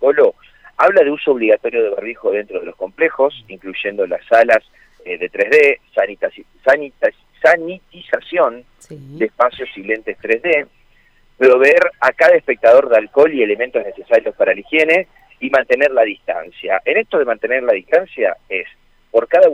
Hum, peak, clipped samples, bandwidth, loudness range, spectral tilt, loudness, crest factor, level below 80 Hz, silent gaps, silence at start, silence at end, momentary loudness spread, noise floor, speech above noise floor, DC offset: none; 0 dBFS; under 0.1%; 9.2 kHz; 6 LU; -5 dB/octave; -15 LUFS; 14 dB; -56 dBFS; none; 0 s; 0 s; 13 LU; -52 dBFS; 37 dB; under 0.1%